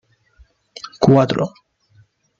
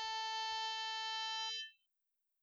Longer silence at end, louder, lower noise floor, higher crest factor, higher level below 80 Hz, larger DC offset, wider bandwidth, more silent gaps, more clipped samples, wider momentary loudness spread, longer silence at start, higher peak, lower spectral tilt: first, 0.9 s vs 0.7 s; first, -16 LUFS vs -40 LUFS; second, -55 dBFS vs -87 dBFS; first, 20 dB vs 10 dB; first, -54 dBFS vs -86 dBFS; neither; second, 7.6 kHz vs over 20 kHz; neither; neither; first, 22 LU vs 4 LU; first, 0.85 s vs 0 s; first, 0 dBFS vs -32 dBFS; first, -7.5 dB/octave vs 4.5 dB/octave